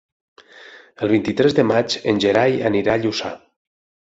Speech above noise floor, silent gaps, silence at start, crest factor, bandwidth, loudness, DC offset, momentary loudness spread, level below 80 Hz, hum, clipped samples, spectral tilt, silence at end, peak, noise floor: 26 dB; none; 0.55 s; 18 dB; 8 kHz; -18 LUFS; under 0.1%; 10 LU; -54 dBFS; none; under 0.1%; -5.5 dB/octave; 0.65 s; -2 dBFS; -44 dBFS